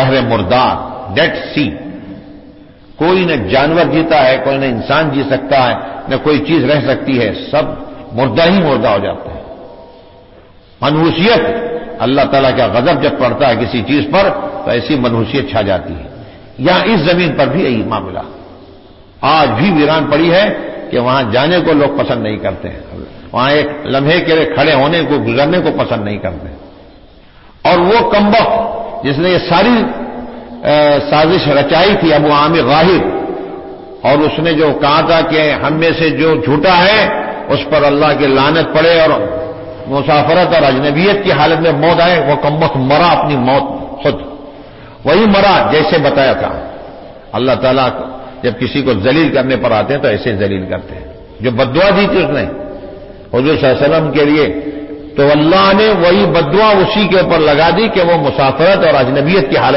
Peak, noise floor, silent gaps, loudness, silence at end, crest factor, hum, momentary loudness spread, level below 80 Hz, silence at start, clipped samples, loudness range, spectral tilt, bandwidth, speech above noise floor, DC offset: 0 dBFS; -40 dBFS; none; -11 LUFS; 0 s; 12 dB; none; 13 LU; -36 dBFS; 0 s; under 0.1%; 4 LU; -10 dB/octave; 5.8 kHz; 29 dB; under 0.1%